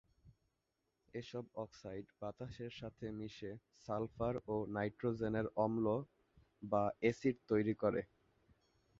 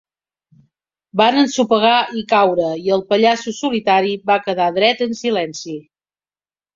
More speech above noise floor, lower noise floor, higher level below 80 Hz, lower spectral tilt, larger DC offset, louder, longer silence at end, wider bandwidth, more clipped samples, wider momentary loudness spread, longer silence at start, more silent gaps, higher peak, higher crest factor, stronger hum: second, 46 dB vs over 74 dB; second, -86 dBFS vs under -90 dBFS; about the same, -66 dBFS vs -62 dBFS; first, -6.5 dB/octave vs -4 dB/octave; neither; second, -41 LUFS vs -16 LUFS; about the same, 0.95 s vs 0.95 s; about the same, 7.6 kHz vs 7.6 kHz; neither; first, 14 LU vs 8 LU; second, 0.25 s vs 1.15 s; neither; second, -22 dBFS vs 0 dBFS; about the same, 20 dB vs 16 dB; neither